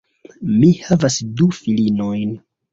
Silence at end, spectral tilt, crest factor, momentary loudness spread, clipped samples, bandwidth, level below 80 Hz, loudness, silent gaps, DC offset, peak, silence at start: 0.35 s; -6.5 dB/octave; 16 dB; 12 LU; under 0.1%; 7.8 kHz; -50 dBFS; -17 LUFS; none; under 0.1%; -2 dBFS; 0.4 s